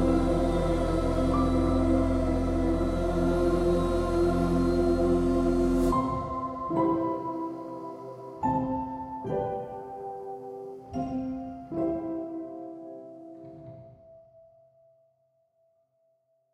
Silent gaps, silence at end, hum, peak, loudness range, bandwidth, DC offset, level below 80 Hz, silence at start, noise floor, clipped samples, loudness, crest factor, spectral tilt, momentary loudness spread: none; 2.35 s; none; -12 dBFS; 12 LU; 12.5 kHz; under 0.1%; -38 dBFS; 0 s; -71 dBFS; under 0.1%; -28 LUFS; 16 dB; -8 dB/octave; 16 LU